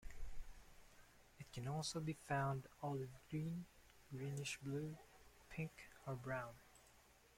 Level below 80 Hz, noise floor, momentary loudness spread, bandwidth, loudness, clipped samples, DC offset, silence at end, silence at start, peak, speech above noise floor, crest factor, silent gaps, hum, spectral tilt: -62 dBFS; -70 dBFS; 23 LU; 16.5 kHz; -48 LUFS; under 0.1%; under 0.1%; 0.2 s; 0 s; -30 dBFS; 23 dB; 20 dB; none; none; -5.5 dB/octave